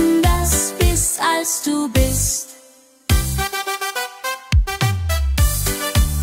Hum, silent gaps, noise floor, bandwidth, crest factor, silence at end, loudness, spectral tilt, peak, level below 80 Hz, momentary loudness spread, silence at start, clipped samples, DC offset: none; none; -49 dBFS; 16 kHz; 14 dB; 0 s; -19 LUFS; -4 dB/octave; -4 dBFS; -22 dBFS; 8 LU; 0 s; under 0.1%; under 0.1%